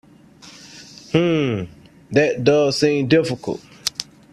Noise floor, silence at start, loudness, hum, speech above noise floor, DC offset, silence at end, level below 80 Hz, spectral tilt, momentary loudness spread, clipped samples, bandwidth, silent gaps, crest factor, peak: -46 dBFS; 0.45 s; -19 LUFS; none; 28 dB; under 0.1%; 0.3 s; -54 dBFS; -5.5 dB/octave; 21 LU; under 0.1%; 14 kHz; none; 20 dB; 0 dBFS